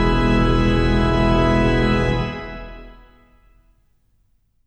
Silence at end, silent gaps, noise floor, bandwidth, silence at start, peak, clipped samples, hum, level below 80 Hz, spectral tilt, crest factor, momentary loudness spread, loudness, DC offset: 1.75 s; none; -61 dBFS; 8.8 kHz; 0 s; -6 dBFS; under 0.1%; none; -26 dBFS; -7.5 dB/octave; 14 dB; 16 LU; -18 LUFS; under 0.1%